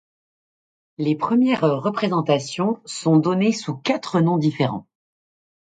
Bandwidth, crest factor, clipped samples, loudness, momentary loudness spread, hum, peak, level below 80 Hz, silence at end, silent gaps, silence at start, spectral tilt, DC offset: 9.4 kHz; 18 dB; under 0.1%; -21 LUFS; 7 LU; none; -4 dBFS; -66 dBFS; 0.8 s; none; 1 s; -6.5 dB/octave; under 0.1%